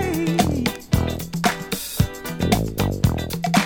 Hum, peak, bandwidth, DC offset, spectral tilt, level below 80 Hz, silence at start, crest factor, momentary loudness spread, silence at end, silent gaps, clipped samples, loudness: none; -4 dBFS; 20 kHz; under 0.1%; -5 dB/octave; -34 dBFS; 0 s; 18 dB; 6 LU; 0 s; none; under 0.1%; -22 LUFS